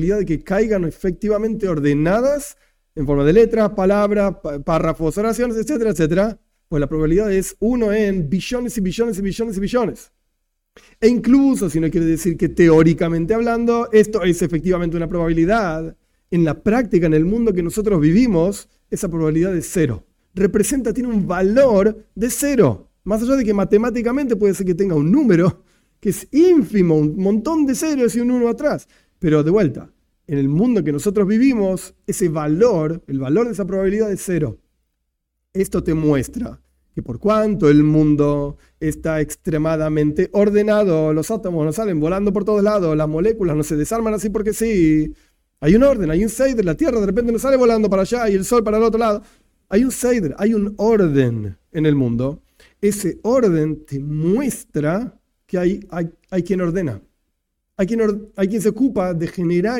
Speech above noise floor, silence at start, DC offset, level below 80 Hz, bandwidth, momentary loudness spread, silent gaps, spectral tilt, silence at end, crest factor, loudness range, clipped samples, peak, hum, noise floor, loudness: 57 dB; 0 s; under 0.1%; -38 dBFS; 17 kHz; 10 LU; none; -7 dB/octave; 0 s; 16 dB; 4 LU; under 0.1%; 0 dBFS; none; -74 dBFS; -18 LUFS